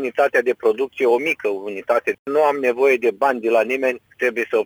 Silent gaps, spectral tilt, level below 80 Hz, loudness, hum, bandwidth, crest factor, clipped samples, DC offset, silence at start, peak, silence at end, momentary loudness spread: 2.19-2.25 s; -4.5 dB/octave; -70 dBFS; -19 LUFS; none; over 20 kHz; 14 dB; under 0.1%; under 0.1%; 0 s; -6 dBFS; 0 s; 6 LU